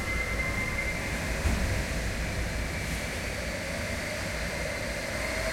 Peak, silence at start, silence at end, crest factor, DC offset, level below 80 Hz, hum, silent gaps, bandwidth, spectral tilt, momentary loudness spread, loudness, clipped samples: -14 dBFS; 0 s; 0 s; 16 dB; under 0.1%; -36 dBFS; none; none; 16.5 kHz; -4 dB/octave; 3 LU; -31 LUFS; under 0.1%